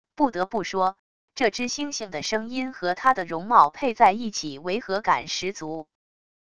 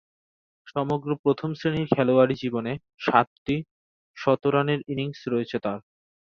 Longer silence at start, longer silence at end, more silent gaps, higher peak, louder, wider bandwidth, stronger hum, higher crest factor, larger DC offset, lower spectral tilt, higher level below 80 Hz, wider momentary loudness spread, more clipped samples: second, 0.05 s vs 0.65 s; about the same, 0.65 s vs 0.6 s; second, 0.99-1.28 s vs 1.19-1.24 s, 3.27-3.46 s, 3.71-4.14 s; about the same, -2 dBFS vs -2 dBFS; about the same, -24 LUFS vs -25 LUFS; first, 11 kHz vs 6.8 kHz; neither; about the same, 22 dB vs 24 dB; first, 0.4% vs under 0.1%; second, -3.5 dB/octave vs -8 dB/octave; about the same, -60 dBFS vs -60 dBFS; about the same, 11 LU vs 9 LU; neither